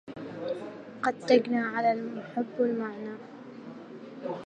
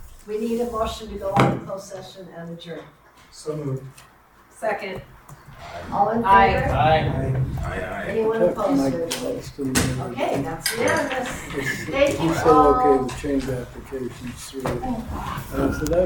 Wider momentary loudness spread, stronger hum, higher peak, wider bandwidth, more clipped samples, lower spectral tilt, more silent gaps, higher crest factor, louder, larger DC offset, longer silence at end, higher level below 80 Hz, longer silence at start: about the same, 21 LU vs 19 LU; neither; second, -8 dBFS vs 0 dBFS; second, 9 kHz vs 19 kHz; neither; about the same, -6 dB/octave vs -5.5 dB/octave; neither; about the same, 24 dB vs 22 dB; second, -30 LUFS vs -22 LUFS; neither; about the same, 0 s vs 0 s; second, -78 dBFS vs -40 dBFS; about the same, 0.05 s vs 0 s